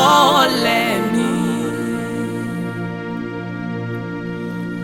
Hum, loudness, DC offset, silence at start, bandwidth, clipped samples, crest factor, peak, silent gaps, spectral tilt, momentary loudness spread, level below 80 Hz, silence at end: none; -19 LUFS; under 0.1%; 0 s; 17 kHz; under 0.1%; 18 dB; 0 dBFS; none; -4.5 dB/octave; 13 LU; -54 dBFS; 0 s